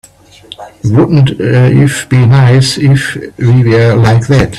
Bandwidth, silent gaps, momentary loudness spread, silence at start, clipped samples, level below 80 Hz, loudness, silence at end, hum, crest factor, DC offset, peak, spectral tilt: 12 kHz; none; 9 LU; 0.6 s; under 0.1%; -34 dBFS; -8 LUFS; 0 s; none; 8 dB; under 0.1%; 0 dBFS; -6.5 dB/octave